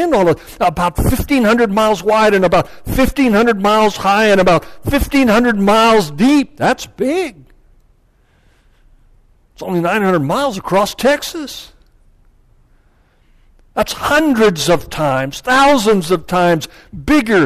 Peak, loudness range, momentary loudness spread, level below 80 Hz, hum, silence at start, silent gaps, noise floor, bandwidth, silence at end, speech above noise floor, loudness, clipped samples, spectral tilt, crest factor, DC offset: -4 dBFS; 9 LU; 9 LU; -32 dBFS; none; 0 s; none; -53 dBFS; 14 kHz; 0 s; 40 dB; -13 LUFS; under 0.1%; -5 dB/octave; 10 dB; under 0.1%